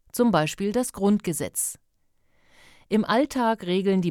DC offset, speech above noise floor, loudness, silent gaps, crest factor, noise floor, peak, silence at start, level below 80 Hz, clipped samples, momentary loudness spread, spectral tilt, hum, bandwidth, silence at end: under 0.1%; 42 dB; -24 LUFS; none; 16 dB; -66 dBFS; -8 dBFS; 0.15 s; -58 dBFS; under 0.1%; 6 LU; -5 dB/octave; none; 17.5 kHz; 0 s